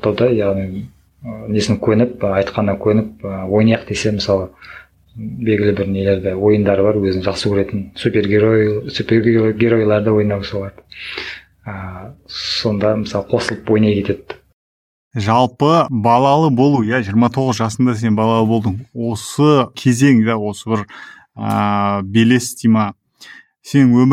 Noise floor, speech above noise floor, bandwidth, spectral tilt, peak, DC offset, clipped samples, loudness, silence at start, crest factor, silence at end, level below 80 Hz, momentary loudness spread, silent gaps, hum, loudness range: -42 dBFS; 26 dB; 14 kHz; -6.5 dB/octave; 0 dBFS; under 0.1%; under 0.1%; -16 LUFS; 0.05 s; 16 dB; 0 s; -48 dBFS; 16 LU; 14.53-15.11 s; none; 4 LU